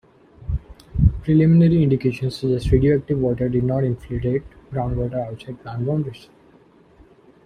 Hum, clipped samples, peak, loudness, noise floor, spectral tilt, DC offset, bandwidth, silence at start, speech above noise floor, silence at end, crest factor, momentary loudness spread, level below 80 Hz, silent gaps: none; under 0.1%; -4 dBFS; -21 LUFS; -52 dBFS; -9.5 dB/octave; under 0.1%; 9.8 kHz; 0.4 s; 33 dB; 1.3 s; 18 dB; 16 LU; -34 dBFS; none